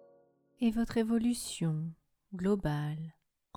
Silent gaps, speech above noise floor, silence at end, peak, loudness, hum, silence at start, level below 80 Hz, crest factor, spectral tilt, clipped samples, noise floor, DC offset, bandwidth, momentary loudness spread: none; 35 dB; 0.45 s; -18 dBFS; -33 LUFS; none; 0.6 s; -54 dBFS; 16 dB; -6 dB/octave; under 0.1%; -67 dBFS; under 0.1%; 16 kHz; 13 LU